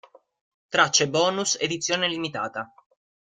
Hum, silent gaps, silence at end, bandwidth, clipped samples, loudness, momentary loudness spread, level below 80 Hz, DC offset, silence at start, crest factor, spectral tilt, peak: none; none; 0.65 s; 11 kHz; under 0.1%; -23 LUFS; 12 LU; -68 dBFS; under 0.1%; 0.7 s; 22 dB; -2 dB/octave; -4 dBFS